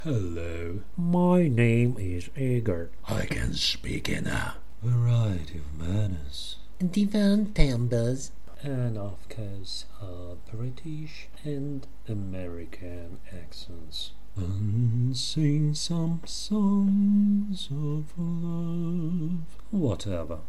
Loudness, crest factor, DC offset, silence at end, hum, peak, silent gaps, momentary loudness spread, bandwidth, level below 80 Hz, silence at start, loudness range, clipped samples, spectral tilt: -28 LUFS; 24 dB; 3%; 0 s; none; -4 dBFS; none; 17 LU; 12.5 kHz; -40 dBFS; 0 s; 11 LU; under 0.1%; -6.5 dB/octave